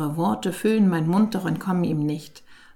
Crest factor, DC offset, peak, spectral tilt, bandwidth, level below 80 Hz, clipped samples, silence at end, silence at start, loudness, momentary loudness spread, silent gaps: 14 dB; under 0.1%; -10 dBFS; -7 dB/octave; 16.5 kHz; -62 dBFS; under 0.1%; 0.2 s; 0 s; -23 LUFS; 6 LU; none